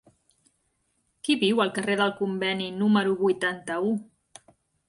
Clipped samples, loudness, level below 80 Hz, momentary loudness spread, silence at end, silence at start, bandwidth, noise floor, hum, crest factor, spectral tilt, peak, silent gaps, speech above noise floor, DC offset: under 0.1%; -25 LUFS; -70 dBFS; 6 LU; 0.85 s; 1.25 s; 11.5 kHz; -73 dBFS; none; 18 dB; -5 dB/octave; -10 dBFS; none; 48 dB; under 0.1%